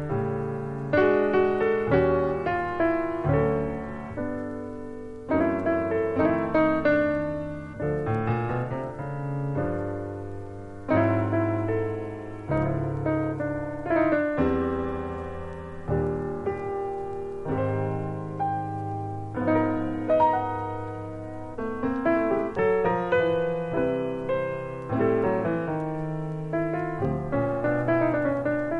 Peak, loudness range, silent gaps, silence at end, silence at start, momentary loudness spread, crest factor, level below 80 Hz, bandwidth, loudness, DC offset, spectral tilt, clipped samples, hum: -10 dBFS; 5 LU; none; 0 s; 0 s; 11 LU; 18 dB; -46 dBFS; 9.2 kHz; -27 LUFS; under 0.1%; -9.5 dB/octave; under 0.1%; none